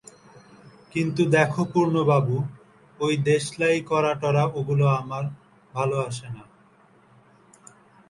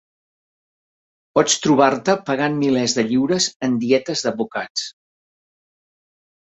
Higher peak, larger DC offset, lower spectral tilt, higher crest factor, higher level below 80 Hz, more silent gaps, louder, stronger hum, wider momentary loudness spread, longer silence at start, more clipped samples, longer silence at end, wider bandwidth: second, -6 dBFS vs -2 dBFS; neither; first, -6.5 dB/octave vs -3.5 dB/octave; about the same, 18 dB vs 20 dB; about the same, -62 dBFS vs -62 dBFS; second, none vs 3.56-3.60 s, 4.70-4.75 s; second, -23 LUFS vs -19 LUFS; neither; first, 13 LU vs 9 LU; second, 0.95 s vs 1.35 s; neither; about the same, 1.65 s vs 1.55 s; first, 11.5 kHz vs 8.2 kHz